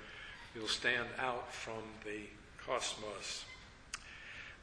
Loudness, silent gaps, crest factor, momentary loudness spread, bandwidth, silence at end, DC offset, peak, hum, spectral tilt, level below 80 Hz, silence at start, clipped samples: -41 LUFS; none; 22 dB; 15 LU; 11 kHz; 0 s; under 0.1%; -20 dBFS; none; -2 dB/octave; -64 dBFS; 0 s; under 0.1%